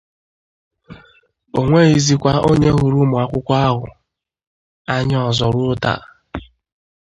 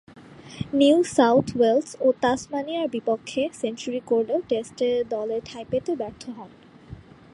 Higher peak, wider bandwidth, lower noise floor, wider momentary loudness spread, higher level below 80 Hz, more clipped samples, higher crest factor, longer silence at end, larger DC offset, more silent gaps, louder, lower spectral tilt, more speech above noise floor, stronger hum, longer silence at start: first, 0 dBFS vs -6 dBFS; second, 9 kHz vs 11.5 kHz; first, -54 dBFS vs -44 dBFS; first, 20 LU vs 13 LU; first, -40 dBFS vs -58 dBFS; neither; about the same, 18 dB vs 18 dB; first, 0.7 s vs 0.35 s; neither; first, 4.47-4.85 s vs none; first, -16 LUFS vs -24 LUFS; about the same, -6 dB/octave vs -5 dB/octave; first, 39 dB vs 21 dB; neither; first, 0.9 s vs 0.15 s